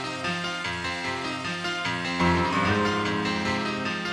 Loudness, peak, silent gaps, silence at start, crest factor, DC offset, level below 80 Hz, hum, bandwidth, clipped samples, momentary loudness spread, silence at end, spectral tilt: -26 LUFS; -10 dBFS; none; 0 s; 16 dB; under 0.1%; -50 dBFS; none; 12 kHz; under 0.1%; 6 LU; 0 s; -4.5 dB/octave